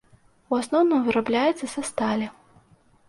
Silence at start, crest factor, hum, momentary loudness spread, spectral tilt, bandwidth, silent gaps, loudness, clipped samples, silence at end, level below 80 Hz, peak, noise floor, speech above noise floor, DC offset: 0.5 s; 14 dB; none; 9 LU; -4.5 dB/octave; 11.5 kHz; none; -24 LUFS; under 0.1%; 0.75 s; -64 dBFS; -10 dBFS; -58 dBFS; 35 dB; under 0.1%